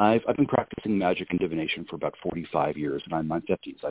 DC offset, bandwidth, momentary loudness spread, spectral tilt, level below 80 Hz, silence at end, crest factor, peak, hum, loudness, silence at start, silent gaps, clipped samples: under 0.1%; 4 kHz; 7 LU; -10.5 dB/octave; -56 dBFS; 0 s; 20 dB; -6 dBFS; none; -28 LUFS; 0 s; none; under 0.1%